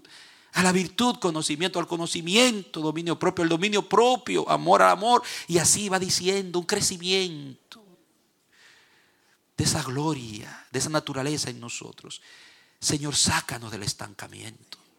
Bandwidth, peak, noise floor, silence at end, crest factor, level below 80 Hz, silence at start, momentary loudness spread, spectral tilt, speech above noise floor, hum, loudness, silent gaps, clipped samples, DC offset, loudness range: 17 kHz; -2 dBFS; -67 dBFS; 0.45 s; 24 dB; -58 dBFS; 0.1 s; 19 LU; -3 dB/octave; 42 dB; none; -24 LUFS; none; under 0.1%; under 0.1%; 9 LU